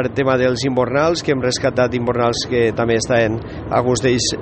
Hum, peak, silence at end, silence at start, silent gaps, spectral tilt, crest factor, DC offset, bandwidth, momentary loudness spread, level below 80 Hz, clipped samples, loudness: none; -2 dBFS; 0 s; 0 s; none; -4.5 dB/octave; 16 dB; under 0.1%; 8.8 kHz; 2 LU; -42 dBFS; under 0.1%; -17 LUFS